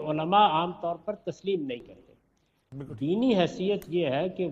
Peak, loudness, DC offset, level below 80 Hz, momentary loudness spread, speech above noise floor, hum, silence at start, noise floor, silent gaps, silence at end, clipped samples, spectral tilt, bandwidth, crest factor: -10 dBFS; -27 LUFS; under 0.1%; -64 dBFS; 16 LU; 43 dB; none; 0 s; -70 dBFS; none; 0 s; under 0.1%; -7 dB/octave; 13 kHz; 20 dB